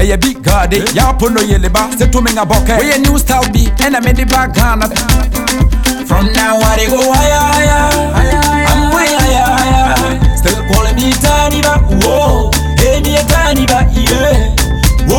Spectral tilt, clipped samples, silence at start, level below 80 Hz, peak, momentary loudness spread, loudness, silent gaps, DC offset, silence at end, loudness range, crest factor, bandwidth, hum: -4.5 dB/octave; under 0.1%; 0 s; -14 dBFS; 0 dBFS; 3 LU; -10 LUFS; none; under 0.1%; 0 s; 1 LU; 10 dB; 18.5 kHz; none